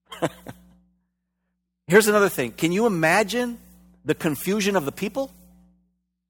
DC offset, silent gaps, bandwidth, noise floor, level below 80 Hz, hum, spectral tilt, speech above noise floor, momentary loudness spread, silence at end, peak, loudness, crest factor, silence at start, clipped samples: under 0.1%; none; 18 kHz; -77 dBFS; -58 dBFS; none; -4.5 dB/octave; 56 dB; 14 LU; 1 s; -2 dBFS; -22 LUFS; 22 dB; 0.1 s; under 0.1%